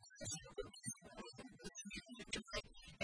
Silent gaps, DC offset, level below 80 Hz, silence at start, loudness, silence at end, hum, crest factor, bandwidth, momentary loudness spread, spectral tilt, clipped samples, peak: none; under 0.1%; -64 dBFS; 0 s; -50 LUFS; 0 s; none; 22 dB; 10.5 kHz; 9 LU; -2.5 dB/octave; under 0.1%; -28 dBFS